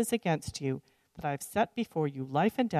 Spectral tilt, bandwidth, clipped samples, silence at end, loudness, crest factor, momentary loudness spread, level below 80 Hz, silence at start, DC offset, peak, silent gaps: -5.5 dB/octave; 14 kHz; under 0.1%; 0 s; -32 LUFS; 16 dB; 7 LU; -62 dBFS; 0 s; under 0.1%; -14 dBFS; none